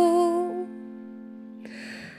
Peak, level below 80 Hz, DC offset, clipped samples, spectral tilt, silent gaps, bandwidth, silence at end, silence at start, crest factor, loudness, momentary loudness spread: -12 dBFS; -76 dBFS; under 0.1%; under 0.1%; -5.5 dB/octave; none; 13.5 kHz; 0 s; 0 s; 16 dB; -27 LUFS; 20 LU